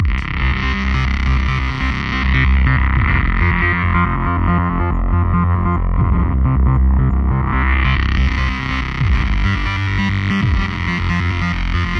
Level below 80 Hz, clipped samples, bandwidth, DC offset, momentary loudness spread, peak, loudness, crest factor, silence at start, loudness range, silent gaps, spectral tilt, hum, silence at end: -18 dBFS; under 0.1%; 6.6 kHz; under 0.1%; 4 LU; -2 dBFS; -17 LUFS; 14 dB; 0 s; 2 LU; none; -7 dB/octave; none; 0 s